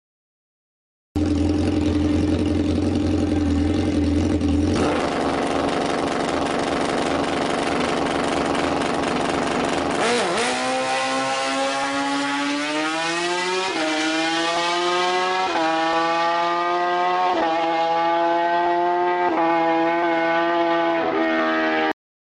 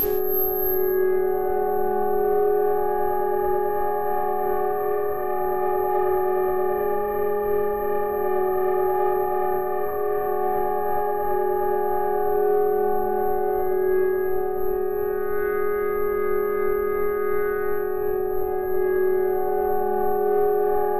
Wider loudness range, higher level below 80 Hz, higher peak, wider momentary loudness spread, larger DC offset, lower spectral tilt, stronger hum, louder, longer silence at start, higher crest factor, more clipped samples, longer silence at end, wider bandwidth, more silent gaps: about the same, 2 LU vs 2 LU; first, -40 dBFS vs -46 dBFS; first, -8 dBFS vs -12 dBFS; about the same, 3 LU vs 4 LU; second, under 0.1% vs 3%; second, -4.5 dB/octave vs -8.5 dB/octave; neither; about the same, -21 LUFS vs -23 LUFS; first, 1.15 s vs 0 s; about the same, 12 dB vs 10 dB; neither; first, 0.35 s vs 0 s; second, 11 kHz vs 14 kHz; neither